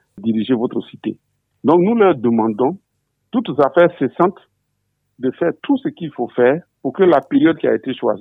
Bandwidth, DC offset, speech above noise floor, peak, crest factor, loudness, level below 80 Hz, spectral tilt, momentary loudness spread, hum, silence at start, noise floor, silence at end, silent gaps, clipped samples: 4.4 kHz; under 0.1%; 54 dB; -2 dBFS; 16 dB; -17 LUFS; -64 dBFS; -9.5 dB/octave; 11 LU; none; 0.15 s; -70 dBFS; 0 s; none; under 0.1%